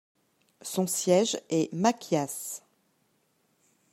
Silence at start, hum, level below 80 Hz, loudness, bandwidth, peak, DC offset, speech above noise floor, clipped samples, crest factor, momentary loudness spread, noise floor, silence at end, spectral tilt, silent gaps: 0.65 s; none; -78 dBFS; -28 LUFS; 16 kHz; -10 dBFS; under 0.1%; 44 dB; under 0.1%; 22 dB; 14 LU; -71 dBFS; 1.35 s; -4.5 dB/octave; none